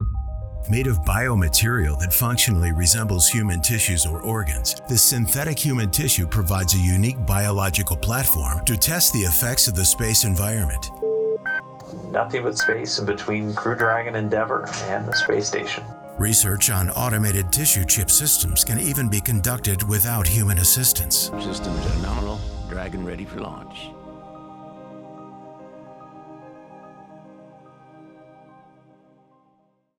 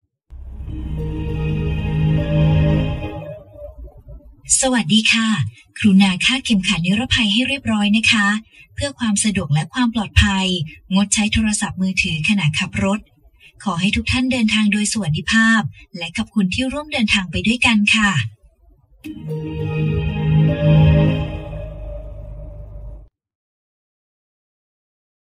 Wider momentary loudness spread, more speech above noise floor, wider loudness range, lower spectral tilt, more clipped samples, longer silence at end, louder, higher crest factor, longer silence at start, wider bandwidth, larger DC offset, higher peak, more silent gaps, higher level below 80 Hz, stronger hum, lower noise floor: second, 16 LU vs 19 LU; first, 43 dB vs 35 dB; first, 11 LU vs 5 LU; second, -3 dB/octave vs -4.5 dB/octave; neither; second, 1.9 s vs 2.25 s; second, -20 LUFS vs -17 LUFS; about the same, 20 dB vs 18 dB; second, 0 s vs 0.3 s; first, over 20 kHz vs 12 kHz; neither; about the same, -2 dBFS vs 0 dBFS; neither; about the same, -32 dBFS vs -32 dBFS; neither; first, -64 dBFS vs -52 dBFS